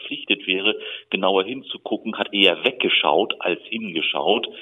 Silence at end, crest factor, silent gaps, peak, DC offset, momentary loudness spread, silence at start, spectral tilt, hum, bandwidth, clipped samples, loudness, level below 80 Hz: 0 s; 20 dB; none; -2 dBFS; under 0.1%; 11 LU; 0 s; -5.5 dB/octave; none; 9.8 kHz; under 0.1%; -21 LUFS; -76 dBFS